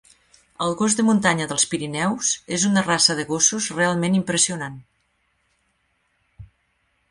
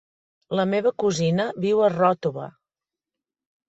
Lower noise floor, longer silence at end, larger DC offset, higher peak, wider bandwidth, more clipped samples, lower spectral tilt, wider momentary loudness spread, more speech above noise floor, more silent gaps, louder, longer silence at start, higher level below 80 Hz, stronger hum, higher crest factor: second, -68 dBFS vs -89 dBFS; second, 0.65 s vs 1.2 s; neither; first, -2 dBFS vs -8 dBFS; first, 11.5 kHz vs 8.2 kHz; neither; second, -3 dB/octave vs -6 dB/octave; second, 6 LU vs 10 LU; second, 48 dB vs 68 dB; neither; about the same, -20 LUFS vs -22 LUFS; about the same, 0.6 s vs 0.5 s; first, -58 dBFS vs -66 dBFS; neither; about the same, 20 dB vs 16 dB